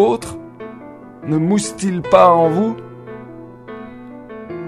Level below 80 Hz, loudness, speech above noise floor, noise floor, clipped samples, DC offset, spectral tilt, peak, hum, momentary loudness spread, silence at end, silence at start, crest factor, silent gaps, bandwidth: -52 dBFS; -15 LUFS; 22 dB; -36 dBFS; under 0.1%; under 0.1%; -6 dB/octave; 0 dBFS; none; 24 LU; 0 s; 0 s; 18 dB; none; 13 kHz